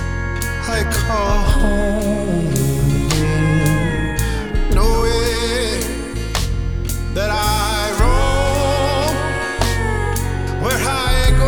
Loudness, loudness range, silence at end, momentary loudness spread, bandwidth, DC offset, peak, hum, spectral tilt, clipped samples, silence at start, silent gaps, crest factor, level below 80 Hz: -18 LUFS; 2 LU; 0 s; 6 LU; over 20 kHz; 1%; 0 dBFS; none; -5 dB/octave; under 0.1%; 0 s; none; 16 dB; -20 dBFS